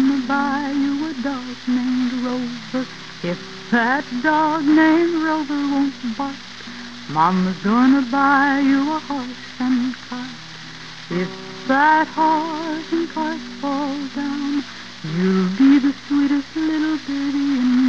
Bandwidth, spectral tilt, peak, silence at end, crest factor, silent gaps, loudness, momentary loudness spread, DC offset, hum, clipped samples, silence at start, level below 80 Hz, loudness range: 7.8 kHz; -6 dB/octave; -2 dBFS; 0 s; 16 dB; none; -20 LUFS; 15 LU; 0.6%; none; under 0.1%; 0 s; -56 dBFS; 4 LU